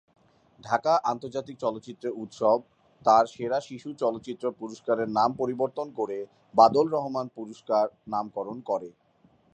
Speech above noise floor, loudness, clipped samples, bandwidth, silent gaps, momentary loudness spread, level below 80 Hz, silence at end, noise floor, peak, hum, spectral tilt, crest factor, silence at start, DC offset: 36 dB; -27 LUFS; under 0.1%; 9 kHz; none; 14 LU; -70 dBFS; 0.65 s; -63 dBFS; -4 dBFS; none; -6 dB/octave; 22 dB; 0.65 s; under 0.1%